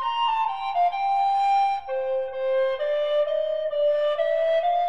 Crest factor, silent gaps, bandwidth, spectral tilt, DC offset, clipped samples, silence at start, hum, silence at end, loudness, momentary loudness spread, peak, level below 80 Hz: 10 dB; none; 8.4 kHz; -2 dB/octave; 0.5%; under 0.1%; 0 s; none; 0 s; -24 LUFS; 5 LU; -14 dBFS; -64 dBFS